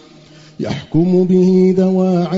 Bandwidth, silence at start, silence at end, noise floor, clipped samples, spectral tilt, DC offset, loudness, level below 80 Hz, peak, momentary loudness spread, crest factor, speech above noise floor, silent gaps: 7.4 kHz; 0.6 s; 0 s; -42 dBFS; under 0.1%; -9 dB/octave; under 0.1%; -13 LUFS; -48 dBFS; -2 dBFS; 12 LU; 12 dB; 29 dB; none